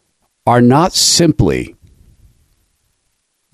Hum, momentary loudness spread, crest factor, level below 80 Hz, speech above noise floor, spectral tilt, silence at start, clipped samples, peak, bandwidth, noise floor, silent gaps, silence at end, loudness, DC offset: none; 12 LU; 14 dB; -36 dBFS; 55 dB; -4 dB/octave; 0.45 s; under 0.1%; -2 dBFS; 15 kHz; -66 dBFS; none; 1.85 s; -11 LUFS; under 0.1%